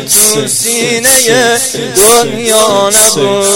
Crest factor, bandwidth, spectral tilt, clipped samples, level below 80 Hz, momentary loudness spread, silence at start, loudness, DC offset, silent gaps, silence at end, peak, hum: 8 dB; over 20 kHz; -1.5 dB/octave; 0.8%; -44 dBFS; 5 LU; 0 s; -7 LUFS; under 0.1%; none; 0 s; 0 dBFS; none